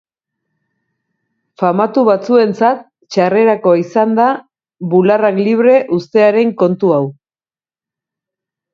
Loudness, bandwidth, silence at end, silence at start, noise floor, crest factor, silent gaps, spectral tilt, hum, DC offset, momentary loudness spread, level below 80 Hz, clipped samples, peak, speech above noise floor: -12 LUFS; 7.4 kHz; 1.6 s; 1.6 s; under -90 dBFS; 14 dB; none; -7.5 dB/octave; none; under 0.1%; 7 LU; -64 dBFS; under 0.1%; 0 dBFS; over 79 dB